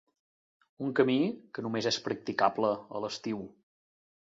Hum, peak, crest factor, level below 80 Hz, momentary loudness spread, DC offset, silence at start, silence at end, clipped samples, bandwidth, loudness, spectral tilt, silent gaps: none; -10 dBFS; 22 dB; -74 dBFS; 11 LU; under 0.1%; 0.8 s; 0.75 s; under 0.1%; 8 kHz; -31 LUFS; -5 dB/octave; none